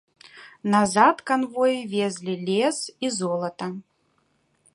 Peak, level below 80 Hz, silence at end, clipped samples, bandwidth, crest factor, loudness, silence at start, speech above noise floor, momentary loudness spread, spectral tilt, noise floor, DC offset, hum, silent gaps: -4 dBFS; -70 dBFS; 0.95 s; under 0.1%; 11.5 kHz; 22 dB; -23 LUFS; 0.25 s; 45 dB; 13 LU; -4.5 dB/octave; -68 dBFS; under 0.1%; none; none